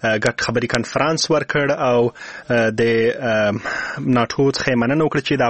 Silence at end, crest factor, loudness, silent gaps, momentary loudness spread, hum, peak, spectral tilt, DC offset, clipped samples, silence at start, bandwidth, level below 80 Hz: 0 s; 18 dB; -18 LUFS; none; 4 LU; none; 0 dBFS; -5 dB/octave; 0.2%; under 0.1%; 0 s; 8.8 kHz; -50 dBFS